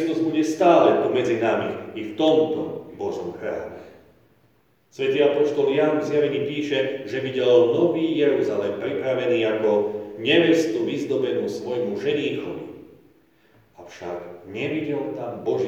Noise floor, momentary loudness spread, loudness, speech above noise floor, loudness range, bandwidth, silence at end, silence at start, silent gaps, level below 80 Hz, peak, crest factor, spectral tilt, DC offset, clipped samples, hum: -62 dBFS; 15 LU; -22 LUFS; 40 dB; 8 LU; 8.8 kHz; 0 s; 0 s; none; -68 dBFS; -4 dBFS; 18 dB; -6 dB/octave; under 0.1%; under 0.1%; none